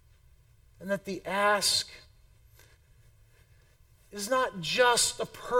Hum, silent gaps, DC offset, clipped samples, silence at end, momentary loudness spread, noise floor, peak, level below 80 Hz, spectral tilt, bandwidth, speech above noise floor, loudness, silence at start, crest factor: none; none; under 0.1%; under 0.1%; 0 s; 16 LU; -61 dBFS; -12 dBFS; -60 dBFS; -1.5 dB/octave; 18 kHz; 32 dB; -27 LUFS; 0.8 s; 20 dB